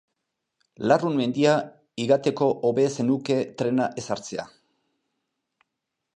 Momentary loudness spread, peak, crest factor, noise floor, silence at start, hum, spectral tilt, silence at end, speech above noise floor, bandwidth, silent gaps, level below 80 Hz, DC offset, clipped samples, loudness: 10 LU; -6 dBFS; 20 dB; -83 dBFS; 0.8 s; none; -6 dB/octave; 1.7 s; 59 dB; 10.5 kHz; none; -70 dBFS; under 0.1%; under 0.1%; -24 LUFS